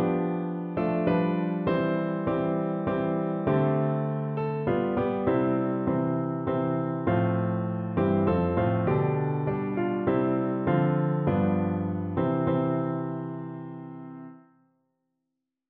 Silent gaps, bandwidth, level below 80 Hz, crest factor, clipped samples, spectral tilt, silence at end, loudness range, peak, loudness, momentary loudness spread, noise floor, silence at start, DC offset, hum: none; 4.5 kHz; -54 dBFS; 16 dB; under 0.1%; -12 dB/octave; 1.3 s; 3 LU; -10 dBFS; -27 LUFS; 6 LU; -84 dBFS; 0 s; under 0.1%; none